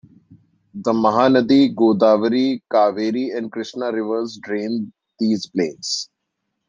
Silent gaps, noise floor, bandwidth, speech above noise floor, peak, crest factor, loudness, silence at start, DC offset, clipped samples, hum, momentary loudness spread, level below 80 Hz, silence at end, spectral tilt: none; -76 dBFS; 9.6 kHz; 58 dB; -2 dBFS; 18 dB; -19 LUFS; 0.75 s; under 0.1%; under 0.1%; none; 12 LU; -66 dBFS; 0.65 s; -5.5 dB/octave